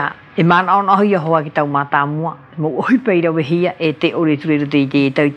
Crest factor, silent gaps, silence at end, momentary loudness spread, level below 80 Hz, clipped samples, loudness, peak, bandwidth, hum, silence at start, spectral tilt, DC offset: 14 dB; none; 0 s; 7 LU; -64 dBFS; under 0.1%; -15 LUFS; 0 dBFS; 8.2 kHz; none; 0 s; -8.5 dB/octave; under 0.1%